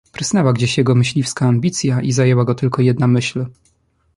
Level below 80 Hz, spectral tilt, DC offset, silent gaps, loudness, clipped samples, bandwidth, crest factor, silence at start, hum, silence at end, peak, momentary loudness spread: -50 dBFS; -6 dB/octave; under 0.1%; none; -16 LUFS; under 0.1%; 11.5 kHz; 14 dB; 0.2 s; none; 0.65 s; -2 dBFS; 4 LU